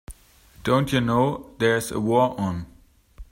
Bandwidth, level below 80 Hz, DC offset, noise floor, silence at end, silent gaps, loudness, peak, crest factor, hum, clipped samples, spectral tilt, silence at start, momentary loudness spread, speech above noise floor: 16 kHz; -48 dBFS; under 0.1%; -52 dBFS; 0.1 s; none; -23 LUFS; -8 dBFS; 16 dB; none; under 0.1%; -6 dB/octave; 0.1 s; 10 LU; 30 dB